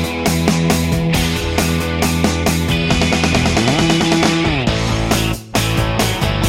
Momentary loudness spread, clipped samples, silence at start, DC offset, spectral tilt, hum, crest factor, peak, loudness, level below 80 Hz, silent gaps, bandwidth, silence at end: 3 LU; under 0.1%; 0 s; under 0.1%; -4.5 dB/octave; none; 14 dB; 0 dBFS; -15 LUFS; -28 dBFS; none; 16.5 kHz; 0 s